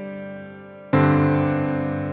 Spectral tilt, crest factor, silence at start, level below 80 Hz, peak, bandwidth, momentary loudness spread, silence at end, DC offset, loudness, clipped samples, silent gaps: -11.5 dB/octave; 16 dB; 0 s; -52 dBFS; -6 dBFS; 4.6 kHz; 20 LU; 0 s; under 0.1%; -20 LUFS; under 0.1%; none